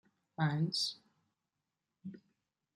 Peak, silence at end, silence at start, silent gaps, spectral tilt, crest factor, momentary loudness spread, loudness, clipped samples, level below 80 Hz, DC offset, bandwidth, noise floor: -20 dBFS; 0.55 s; 0.4 s; none; -4.5 dB/octave; 20 dB; 19 LU; -35 LUFS; under 0.1%; -82 dBFS; under 0.1%; 12.5 kHz; -89 dBFS